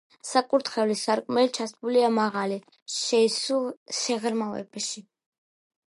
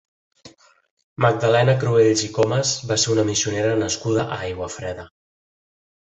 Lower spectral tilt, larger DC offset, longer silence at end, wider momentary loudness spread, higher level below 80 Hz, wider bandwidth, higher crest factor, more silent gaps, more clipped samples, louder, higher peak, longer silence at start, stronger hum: second, -3 dB/octave vs -4.5 dB/octave; neither; second, 0.9 s vs 1.05 s; about the same, 10 LU vs 12 LU; second, -80 dBFS vs -50 dBFS; first, 11.5 kHz vs 8.4 kHz; about the same, 20 dB vs 18 dB; about the same, 2.82-2.86 s, 3.77-3.86 s vs 0.91-0.97 s, 1.04-1.16 s; neither; second, -26 LUFS vs -20 LUFS; second, -8 dBFS vs -2 dBFS; second, 0.25 s vs 0.45 s; neither